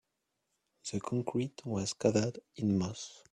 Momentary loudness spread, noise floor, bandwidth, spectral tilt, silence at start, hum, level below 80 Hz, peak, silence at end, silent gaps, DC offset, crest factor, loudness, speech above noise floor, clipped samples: 10 LU; -84 dBFS; 11 kHz; -5.5 dB/octave; 0.85 s; none; -68 dBFS; -14 dBFS; 0.15 s; none; under 0.1%; 22 dB; -34 LUFS; 50 dB; under 0.1%